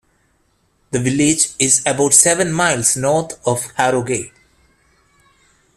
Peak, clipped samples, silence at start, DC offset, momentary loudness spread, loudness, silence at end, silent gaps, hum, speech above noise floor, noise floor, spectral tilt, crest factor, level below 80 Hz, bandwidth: 0 dBFS; under 0.1%; 0.9 s; under 0.1%; 11 LU; -15 LUFS; 1.5 s; none; none; 45 dB; -61 dBFS; -3 dB/octave; 18 dB; -52 dBFS; 15.5 kHz